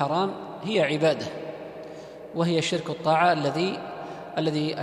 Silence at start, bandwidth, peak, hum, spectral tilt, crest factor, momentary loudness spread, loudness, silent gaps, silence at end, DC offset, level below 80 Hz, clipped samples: 0 s; 12 kHz; -8 dBFS; none; -5.5 dB/octave; 18 dB; 17 LU; -25 LUFS; none; 0 s; under 0.1%; -66 dBFS; under 0.1%